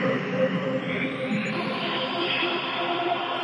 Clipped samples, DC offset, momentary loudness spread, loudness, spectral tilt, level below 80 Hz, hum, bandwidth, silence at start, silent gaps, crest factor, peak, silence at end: under 0.1%; under 0.1%; 3 LU; -26 LUFS; -6 dB/octave; -74 dBFS; none; 11 kHz; 0 s; none; 14 dB; -12 dBFS; 0 s